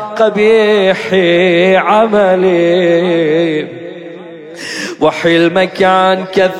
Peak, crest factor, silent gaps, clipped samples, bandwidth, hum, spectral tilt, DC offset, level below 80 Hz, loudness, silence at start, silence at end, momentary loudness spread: 0 dBFS; 10 dB; none; under 0.1%; 11.5 kHz; none; -5.5 dB/octave; under 0.1%; -54 dBFS; -10 LUFS; 0 s; 0 s; 17 LU